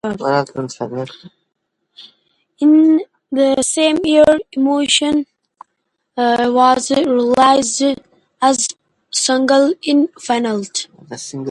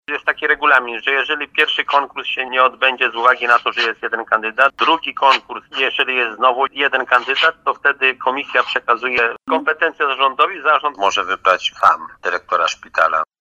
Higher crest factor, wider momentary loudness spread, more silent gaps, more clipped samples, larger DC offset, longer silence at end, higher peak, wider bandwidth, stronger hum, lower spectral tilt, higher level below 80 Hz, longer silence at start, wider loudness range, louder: about the same, 16 dB vs 16 dB; first, 13 LU vs 5 LU; neither; neither; neither; second, 0 s vs 0.15 s; about the same, 0 dBFS vs 0 dBFS; about the same, 11.5 kHz vs 12 kHz; neither; first, -3 dB/octave vs -1.5 dB/octave; first, -56 dBFS vs -62 dBFS; about the same, 0.05 s vs 0.1 s; about the same, 3 LU vs 1 LU; about the same, -15 LUFS vs -16 LUFS